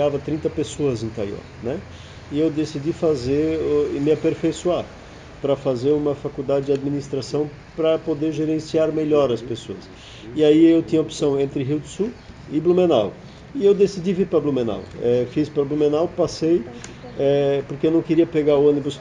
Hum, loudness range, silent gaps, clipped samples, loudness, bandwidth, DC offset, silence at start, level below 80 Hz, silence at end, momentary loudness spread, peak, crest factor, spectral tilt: none; 4 LU; none; under 0.1%; -21 LUFS; 9.8 kHz; under 0.1%; 0 s; -48 dBFS; 0 s; 14 LU; -4 dBFS; 16 dB; -7 dB/octave